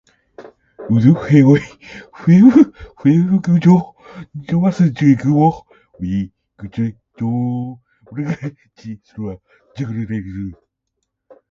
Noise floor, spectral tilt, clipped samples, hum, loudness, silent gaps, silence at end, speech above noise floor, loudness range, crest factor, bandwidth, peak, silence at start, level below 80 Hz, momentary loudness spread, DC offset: -75 dBFS; -9 dB/octave; under 0.1%; none; -15 LUFS; none; 1 s; 60 dB; 14 LU; 16 dB; 7.2 kHz; 0 dBFS; 0.4 s; -48 dBFS; 23 LU; under 0.1%